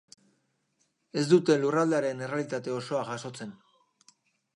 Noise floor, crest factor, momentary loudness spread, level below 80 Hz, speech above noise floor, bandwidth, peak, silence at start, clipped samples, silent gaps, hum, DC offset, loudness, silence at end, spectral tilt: -74 dBFS; 22 dB; 15 LU; -80 dBFS; 47 dB; 11.5 kHz; -8 dBFS; 1.15 s; under 0.1%; none; none; under 0.1%; -28 LUFS; 1 s; -6 dB/octave